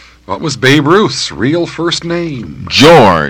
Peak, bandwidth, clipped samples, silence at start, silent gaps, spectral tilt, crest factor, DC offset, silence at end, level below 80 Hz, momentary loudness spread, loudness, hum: 0 dBFS; over 20 kHz; 2%; 0.3 s; none; -4.5 dB/octave; 10 dB; under 0.1%; 0 s; -38 dBFS; 15 LU; -9 LUFS; none